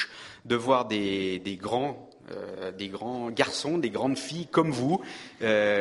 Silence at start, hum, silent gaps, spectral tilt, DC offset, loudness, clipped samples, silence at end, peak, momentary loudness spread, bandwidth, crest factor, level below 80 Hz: 0 s; none; none; -5 dB/octave; under 0.1%; -28 LUFS; under 0.1%; 0 s; -4 dBFS; 13 LU; 11.5 kHz; 24 dB; -66 dBFS